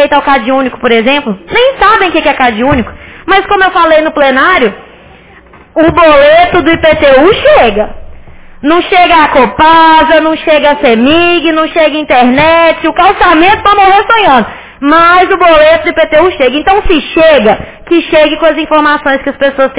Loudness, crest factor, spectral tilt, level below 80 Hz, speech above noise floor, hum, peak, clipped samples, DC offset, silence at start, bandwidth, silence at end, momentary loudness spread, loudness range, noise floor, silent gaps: -6 LUFS; 6 dB; -8 dB/octave; -30 dBFS; 30 dB; none; 0 dBFS; 5%; 1%; 0 s; 4 kHz; 0 s; 6 LU; 3 LU; -36 dBFS; none